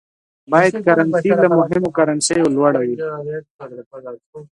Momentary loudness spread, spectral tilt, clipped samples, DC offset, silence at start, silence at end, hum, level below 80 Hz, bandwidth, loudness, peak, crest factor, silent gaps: 20 LU; -5 dB/octave; under 0.1%; under 0.1%; 0.5 s; 0.15 s; none; -58 dBFS; 11.5 kHz; -16 LUFS; 0 dBFS; 16 dB; 3.50-3.59 s, 3.86-3.91 s, 4.26-4.33 s